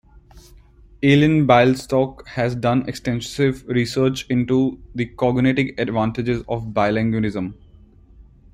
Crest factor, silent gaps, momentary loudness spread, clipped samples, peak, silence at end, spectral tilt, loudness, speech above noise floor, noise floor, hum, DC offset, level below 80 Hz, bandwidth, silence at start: 18 dB; none; 10 LU; under 0.1%; -2 dBFS; 0.3 s; -7 dB/octave; -20 LUFS; 29 dB; -48 dBFS; none; under 0.1%; -46 dBFS; 15 kHz; 0.35 s